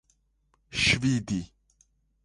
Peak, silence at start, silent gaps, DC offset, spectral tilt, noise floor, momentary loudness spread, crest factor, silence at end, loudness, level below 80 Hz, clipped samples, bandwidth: -10 dBFS; 0.7 s; none; under 0.1%; -3.5 dB/octave; -70 dBFS; 13 LU; 20 dB; 0.8 s; -26 LUFS; -50 dBFS; under 0.1%; 11.5 kHz